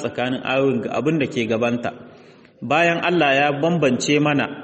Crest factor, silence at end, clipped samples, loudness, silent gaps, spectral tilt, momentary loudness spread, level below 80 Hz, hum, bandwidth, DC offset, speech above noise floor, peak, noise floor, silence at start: 16 dB; 0 s; under 0.1%; -19 LUFS; none; -5 dB/octave; 7 LU; -60 dBFS; none; 8.4 kHz; under 0.1%; 27 dB; -4 dBFS; -47 dBFS; 0 s